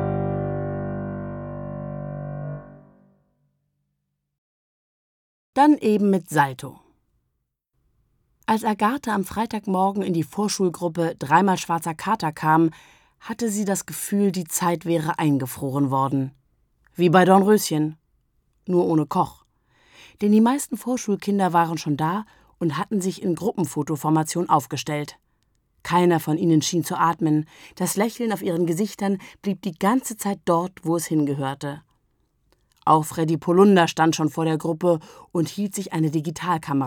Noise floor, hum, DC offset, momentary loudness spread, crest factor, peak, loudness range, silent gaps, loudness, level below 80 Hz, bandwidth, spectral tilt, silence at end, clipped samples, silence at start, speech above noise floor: -77 dBFS; none; under 0.1%; 12 LU; 20 dB; -2 dBFS; 5 LU; 4.38-5.53 s; -22 LUFS; -58 dBFS; 19.5 kHz; -5.5 dB/octave; 0 s; under 0.1%; 0 s; 56 dB